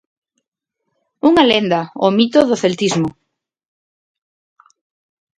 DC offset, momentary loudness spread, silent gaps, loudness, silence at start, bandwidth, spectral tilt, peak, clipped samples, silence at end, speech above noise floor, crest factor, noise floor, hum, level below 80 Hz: under 0.1%; 7 LU; none; -15 LUFS; 1.25 s; 10.5 kHz; -5 dB/octave; 0 dBFS; under 0.1%; 2.3 s; 63 dB; 18 dB; -76 dBFS; none; -56 dBFS